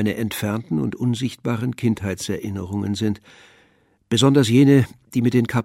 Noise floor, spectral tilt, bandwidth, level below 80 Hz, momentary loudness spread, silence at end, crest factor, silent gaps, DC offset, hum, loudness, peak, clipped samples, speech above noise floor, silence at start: -60 dBFS; -6 dB/octave; 16 kHz; -54 dBFS; 12 LU; 0 s; 16 dB; none; under 0.1%; none; -20 LUFS; -4 dBFS; under 0.1%; 40 dB; 0 s